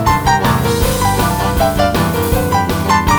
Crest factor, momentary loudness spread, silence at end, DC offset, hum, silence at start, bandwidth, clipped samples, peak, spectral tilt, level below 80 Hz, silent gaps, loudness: 12 dB; 2 LU; 0 s; under 0.1%; none; 0 s; over 20 kHz; under 0.1%; 0 dBFS; -5 dB/octave; -24 dBFS; none; -14 LUFS